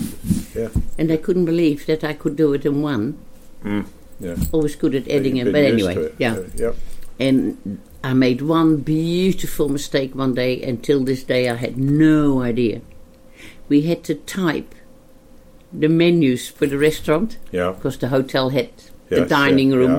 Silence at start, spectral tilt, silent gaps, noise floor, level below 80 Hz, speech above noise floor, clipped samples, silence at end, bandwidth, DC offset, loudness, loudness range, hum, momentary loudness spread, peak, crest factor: 0 s; -6.5 dB/octave; none; -45 dBFS; -36 dBFS; 27 dB; under 0.1%; 0 s; 16.5 kHz; under 0.1%; -19 LUFS; 3 LU; none; 10 LU; -4 dBFS; 14 dB